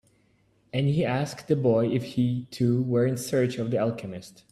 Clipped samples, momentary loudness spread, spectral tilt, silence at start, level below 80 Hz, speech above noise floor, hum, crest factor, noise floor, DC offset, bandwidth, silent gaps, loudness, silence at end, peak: under 0.1%; 7 LU; -7 dB/octave; 0.75 s; -62 dBFS; 39 dB; none; 16 dB; -65 dBFS; under 0.1%; 13.5 kHz; none; -26 LUFS; 0.2 s; -10 dBFS